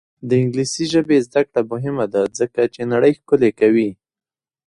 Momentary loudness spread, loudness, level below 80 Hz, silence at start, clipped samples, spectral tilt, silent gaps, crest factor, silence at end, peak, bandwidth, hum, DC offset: 6 LU; -18 LUFS; -58 dBFS; 0.25 s; under 0.1%; -6 dB/octave; none; 16 dB; 0.75 s; -2 dBFS; 11 kHz; none; under 0.1%